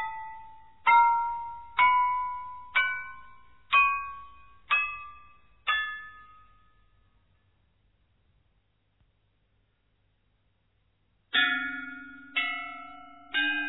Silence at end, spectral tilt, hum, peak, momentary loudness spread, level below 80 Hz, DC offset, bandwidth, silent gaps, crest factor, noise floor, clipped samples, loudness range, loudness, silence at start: 0 s; -4 dB/octave; none; -10 dBFS; 21 LU; -64 dBFS; under 0.1%; 4.1 kHz; none; 20 dB; -72 dBFS; under 0.1%; 11 LU; -26 LUFS; 0 s